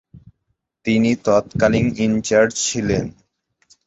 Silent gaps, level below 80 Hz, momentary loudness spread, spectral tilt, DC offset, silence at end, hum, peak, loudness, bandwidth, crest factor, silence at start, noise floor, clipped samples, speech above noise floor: none; -44 dBFS; 6 LU; -5 dB/octave; under 0.1%; 0.75 s; none; -2 dBFS; -18 LUFS; 8.2 kHz; 18 dB; 0.15 s; -72 dBFS; under 0.1%; 55 dB